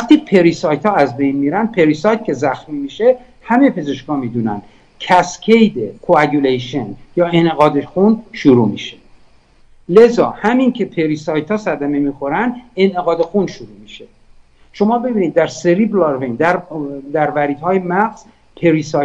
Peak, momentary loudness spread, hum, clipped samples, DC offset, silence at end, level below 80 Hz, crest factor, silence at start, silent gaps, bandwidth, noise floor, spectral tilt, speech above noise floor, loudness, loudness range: 0 dBFS; 10 LU; none; 0.3%; under 0.1%; 0 s; -50 dBFS; 14 dB; 0 s; none; 8.8 kHz; -47 dBFS; -6.5 dB/octave; 33 dB; -15 LUFS; 4 LU